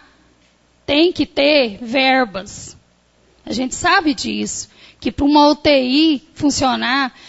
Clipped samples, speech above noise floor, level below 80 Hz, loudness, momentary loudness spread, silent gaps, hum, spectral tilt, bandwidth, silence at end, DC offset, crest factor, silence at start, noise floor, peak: under 0.1%; 39 dB; -44 dBFS; -16 LUFS; 15 LU; none; none; -3 dB/octave; 8 kHz; 0.2 s; under 0.1%; 16 dB; 0.9 s; -56 dBFS; -2 dBFS